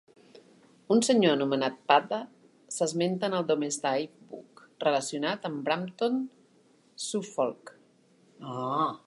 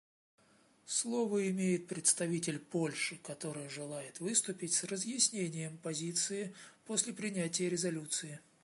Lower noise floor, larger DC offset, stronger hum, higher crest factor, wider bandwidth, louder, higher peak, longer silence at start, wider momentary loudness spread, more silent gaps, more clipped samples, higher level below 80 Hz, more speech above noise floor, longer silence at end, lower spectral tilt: second, -63 dBFS vs -67 dBFS; neither; neither; about the same, 22 dB vs 22 dB; about the same, 11.5 kHz vs 11.5 kHz; first, -28 LUFS vs -35 LUFS; first, -8 dBFS vs -16 dBFS; second, 0.35 s vs 0.85 s; first, 16 LU vs 11 LU; neither; neither; about the same, -82 dBFS vs -84 dBFS; first, 35 dB vs 31 dB; second, 0.1 s vs 0.25 s; about the same, -4 dB/octave vs -3 dB/octave